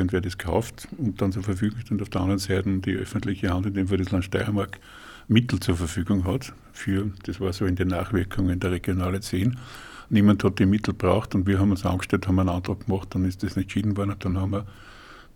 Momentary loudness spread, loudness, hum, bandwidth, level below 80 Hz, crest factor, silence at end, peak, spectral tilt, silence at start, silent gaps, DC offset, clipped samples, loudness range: 9 LU; -25 LUFS; none; 16.5 kHz; -44 dBFS; 20 dB; 0.15 s; -4 dBFS; -7 dB/octave; 0 s; none; under 0.1%; under 0.1%; 4 LU